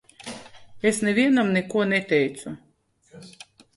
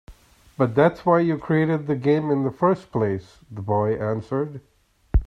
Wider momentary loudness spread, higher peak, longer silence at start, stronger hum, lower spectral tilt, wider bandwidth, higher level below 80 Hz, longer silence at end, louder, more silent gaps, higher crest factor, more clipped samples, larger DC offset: first, 22 LU vs 12 LU; about the same, -6 dBFS vs -4 dBFS; about the same, 0.2 s vs 0.1 s; neither; second, -5 dB/octave vs -9.5 dB/octave; first, 11.5 kHz vs 9.6 kHz; second, -64 dBFS vs -34 dBFS; first, 0.5 s vs 0 s; about the same, -22 LUFS vs -22 LUFS; neither; about the same, 18 dB vs 18 dB; neither; neither